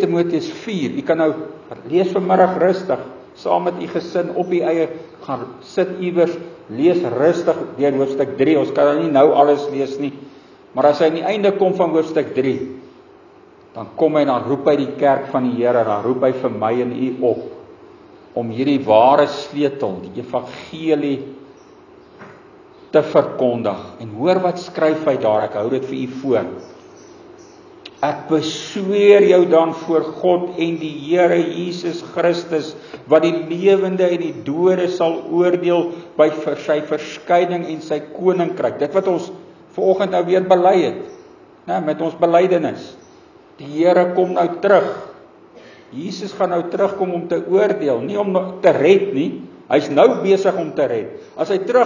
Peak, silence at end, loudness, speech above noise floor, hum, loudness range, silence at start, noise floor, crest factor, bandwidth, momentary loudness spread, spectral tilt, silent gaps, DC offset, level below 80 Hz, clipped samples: 0 dBFS; 0 s; -17 LUFS; 29 dB; none; 5 LU; 0 s; -46 dBFS; 18 dB; 7.2 kHz; 13 LU; -6.5 dB/octave; none; under 0.1%; -64 dBFS; under 0.1%